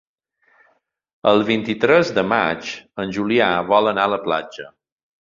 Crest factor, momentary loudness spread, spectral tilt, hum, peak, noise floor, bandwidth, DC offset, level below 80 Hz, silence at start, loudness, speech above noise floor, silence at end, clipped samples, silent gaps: 18 dB; 12 LU; -5.5 dB/octave; none; -2 dBFS; -63 dBFS; 7.6 kHz; under 0.1%; -58 dBFS; 1.25 s; -18 LUFS; 45 dB; 0.55 s; under 0.1%; none